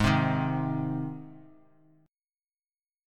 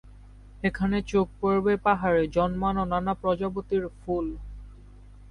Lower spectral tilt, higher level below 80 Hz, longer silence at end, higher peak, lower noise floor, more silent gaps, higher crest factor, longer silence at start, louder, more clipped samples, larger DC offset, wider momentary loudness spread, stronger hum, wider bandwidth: about the same, -7 dB/octave vs -7.5 dB/octave; second, -50 dBFS vs -44 dBFS; first, 1.65 s vs 0 s; about the same, -8 dBFS vs -10 dBFS; first, under -90 dBFS vs -48 dBFS; neither; about the same, 22 dB vs 18 dB; about the same, 0 s vs 0.05 s; second, -29 LUFS vs -26 LUFS; neither; neither; first, 18 LU vs 8 LU; second, none vs 50 Hz at -45 dBFS; first, 12.5 kHz vs 10.5 kHz